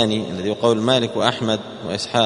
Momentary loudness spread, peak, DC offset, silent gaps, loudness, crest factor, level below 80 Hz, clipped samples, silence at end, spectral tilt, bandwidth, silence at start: 8 LU; 0 dBFS; under 0.1%; none; -20 LUFS; 20 dB; -56 dBFS; under 0.1%; 0 s; -5 dB/octave; 11 kHz; 0 s